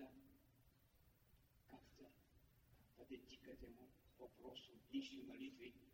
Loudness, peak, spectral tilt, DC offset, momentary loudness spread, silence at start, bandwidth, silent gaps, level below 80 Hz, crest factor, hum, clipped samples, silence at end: -58 LUFS; -38 dBFS; -5 dB/octave; under 0.1%; 17 LU; 0 s; 16 kHz; none; -76 dBFS; 22 dB; none; under 0.1%; 0 s